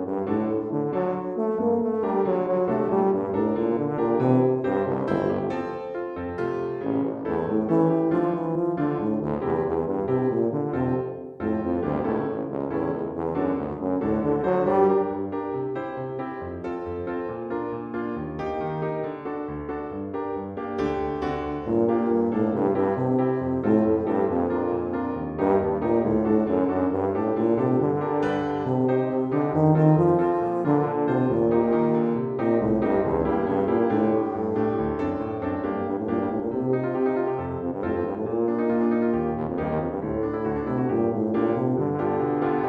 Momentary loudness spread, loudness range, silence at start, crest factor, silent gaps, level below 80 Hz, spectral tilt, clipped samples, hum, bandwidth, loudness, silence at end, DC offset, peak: 9 LU; 6 LU; 0 s; 16 dB; none; -50 dBFS; -10.5 dB/octave; under 0.1%; none; 6.2 kHz; -25 LUFS; 0 s; under 0.1%; -8 dBFS